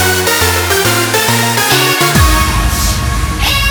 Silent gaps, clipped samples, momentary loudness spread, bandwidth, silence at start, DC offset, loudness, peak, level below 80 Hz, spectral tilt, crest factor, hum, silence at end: none; under 0.1%; 5 LU; over 20 kHz; 0 s; under 0.1%; -10 LUFS; 0 dBFS; -18 dBFS; -3 dB/octave; 10 dB; none; 0 s